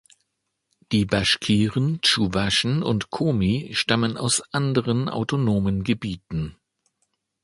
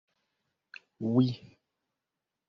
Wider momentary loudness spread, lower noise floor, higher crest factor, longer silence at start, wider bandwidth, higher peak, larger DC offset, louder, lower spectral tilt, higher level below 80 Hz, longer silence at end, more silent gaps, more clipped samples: second, 7 LU vs 24 LU; second, -77 dBFS vs -88 dBFS; about the same, 20 dB vs 22 dB; about the same, 0.9 s vs 1 s; first, 11.5 kHz vs 6.4 kHz; first, -2 dBFS vs -12 dBFS; neither; first, -22 LUFS vs -29 LUFS; second, -4.5 dB/octave vs -8 dB/octave; first, -46 dBFS vs -72 dBFS; about the same, 0.9 s vs 1 s; neither; neither